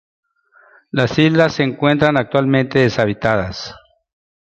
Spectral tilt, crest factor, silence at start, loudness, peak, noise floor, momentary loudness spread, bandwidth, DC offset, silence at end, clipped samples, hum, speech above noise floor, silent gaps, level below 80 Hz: -6.5 dB/octave; 16 dB; 0.95 s; -16 LUFS; -2 dBFS; -52 dBFS; 10 LU; 8.2 kHz; under 0.1%; 0.7 s; under 0.1%; none; 37 dB; none; -46 dBFS